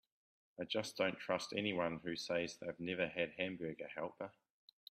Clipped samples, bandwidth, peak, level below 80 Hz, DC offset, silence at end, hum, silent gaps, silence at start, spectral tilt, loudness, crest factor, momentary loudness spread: under 0.1%; 14.5 kHz; -22 dBFS; -78 dBFS; under 0.1%; 0.6 s; none; none; 0.6 s; -4.5 dB/octave; -41 LUFS; 22 dB; 12 LU